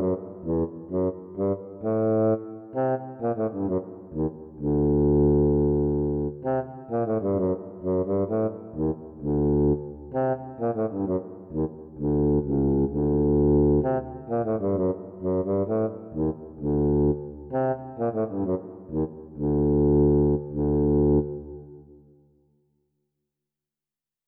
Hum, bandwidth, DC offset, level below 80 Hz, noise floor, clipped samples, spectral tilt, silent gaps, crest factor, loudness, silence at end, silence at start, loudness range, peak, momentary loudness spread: none; 2.8 kHz; under 0.1%; -38 dBFS; under -90 dBFS; under 0.1%; -14 dB/octave; none; 14 dB; -26 LUFS; 2.45 s; 0 s; 4 LU; -12 dBFS; 10 LU